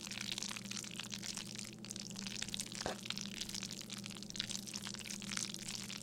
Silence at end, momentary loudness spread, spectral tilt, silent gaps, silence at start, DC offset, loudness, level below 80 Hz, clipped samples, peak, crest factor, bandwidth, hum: 0 s; 5 LU; -2 dB/octave; none; 0 s; under 0.1%; -43 LUFS; -68 dBFS; under 0.1%; -18 dBFS; 28 dB; 17 kHz; none